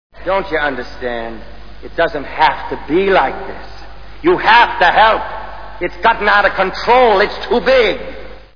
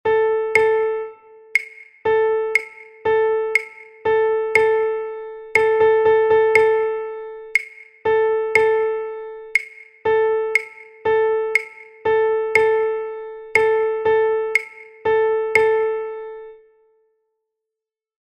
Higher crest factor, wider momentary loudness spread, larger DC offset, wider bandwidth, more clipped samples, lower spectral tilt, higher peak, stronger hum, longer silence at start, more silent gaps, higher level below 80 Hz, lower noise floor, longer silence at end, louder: about the same, 14 dB vs 18 dB; first, 18 LU vs 15 LU; first, 3% vs under 0.1%; second, 5.4 kHz vs 9.8 kHz; neither; first, -5.5 dB/octave vs -3.5 dB/octave; about the same, 0 dBFS vs 0 dBFS; neither; about the same, 0.1 s vs 0.05 s; neither; first, -36 dBFS vs -58 dBFS; second, -34 dBFS vs -86 dBFS; second, 0 s vs 1.8 s; first, -13 LUFS vs -19 LUFS